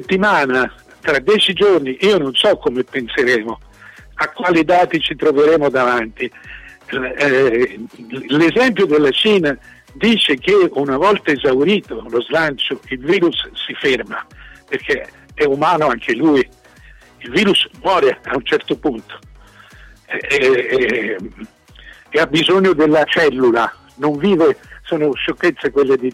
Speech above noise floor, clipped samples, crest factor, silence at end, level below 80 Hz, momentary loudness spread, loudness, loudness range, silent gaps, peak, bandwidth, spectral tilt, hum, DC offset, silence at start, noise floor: 28 dB; under 0.1%; 12 dB; 0 s; -46 dBFS; 12 LU; -15 LUFS; 4 LU; none; -4 dBFS; 12.5 kHz; -5 dB/octave; none; under 0.1%; 0 s; -44 dBFS